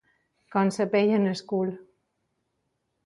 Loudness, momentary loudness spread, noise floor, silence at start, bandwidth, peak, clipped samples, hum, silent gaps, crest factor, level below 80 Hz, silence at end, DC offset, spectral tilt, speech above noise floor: -26 LUFS; 9 LU; -77 dBFS; 0.5 s; 11.5 kHz; -10 dBFS; under 0.1%; none; none; 18 dB; -72 dBFS; 1.25 s; under 0.1%; -6.5 dB/octave; 53 dB